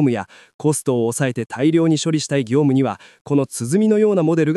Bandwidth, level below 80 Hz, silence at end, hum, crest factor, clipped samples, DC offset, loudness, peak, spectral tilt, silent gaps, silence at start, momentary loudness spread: 13.5 kHz; -68 dBFS; 0 s; none; 12 dB; under 0.1%; under 0.1%; -18 LUFS; -6 dBFS; -6 dB/octave; 0.54-0.59 s, 3.21-3.25 s; 0 s; 7 LU